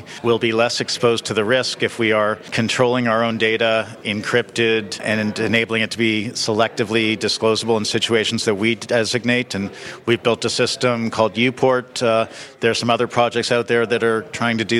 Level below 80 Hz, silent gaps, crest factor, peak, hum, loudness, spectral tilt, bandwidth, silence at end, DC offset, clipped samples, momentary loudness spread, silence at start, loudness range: -60 dBFS; none; 16 dB; -2 dBFS; none; -19 LUFS; -4 dB/octave; 14 kHz; 0 s; under 0.1%; under 0.1%; 4 LU; 0 s; 1 LU